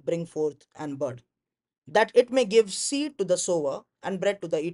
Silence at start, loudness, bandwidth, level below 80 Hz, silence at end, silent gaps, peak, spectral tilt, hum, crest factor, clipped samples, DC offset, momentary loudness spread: 0.05 s; -26 LUFS; 11.5 kHz; -74 dBFS; 0 s; none; -6 dBFS; -3.5 dB/octave; none; 20 dB; under 0.1%; under 0.1%; 13 LU